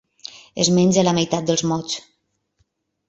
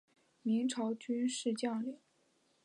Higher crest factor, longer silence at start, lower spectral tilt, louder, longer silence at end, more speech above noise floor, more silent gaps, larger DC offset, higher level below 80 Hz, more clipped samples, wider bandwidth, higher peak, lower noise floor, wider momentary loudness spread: about the same, 18 dB vs 14 dB; about the same, 0.35 s vs 0.45 s; about the same, -4.5 dB/octave vs -4.5 dB/octave; first, -19 LUFS vs -37 LUFS; first, 1.1 s vs 0.7 s; first, 50 dB vs 39 dB; neither; neither; first, -58 dBFS vs -90 dBFS; neither; second, 8 kHz vs 11.5 kHz; first, -4 dBFS vs -24 dBFS; second, -68 dBFS vs -74 dBFS; first, 18 LU vs 9 LU